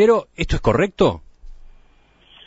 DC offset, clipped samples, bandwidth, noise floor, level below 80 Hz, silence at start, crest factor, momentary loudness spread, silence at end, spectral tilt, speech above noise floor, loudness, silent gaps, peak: under 0.1%; under 0.1%; 8 kHz; -53 dBFS; -34 dBFS; 0 s; 18 dB; 8 LU; 0.8 s; -6.5 dB/octave; 36 dB; -19 LUFS; none; -4 dBFS